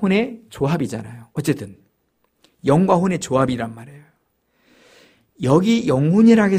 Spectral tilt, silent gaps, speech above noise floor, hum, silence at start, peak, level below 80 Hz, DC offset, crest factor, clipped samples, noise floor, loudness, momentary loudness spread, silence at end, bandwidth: -7 dB/octave; none; 50 dB; none; 0 s; -2 dBFS; -52 dBFS; under 0.1%; 18 dB; under 0.1%; -67 dBFS; -19 LUFS; 16 LU; 0 s; 15 kHz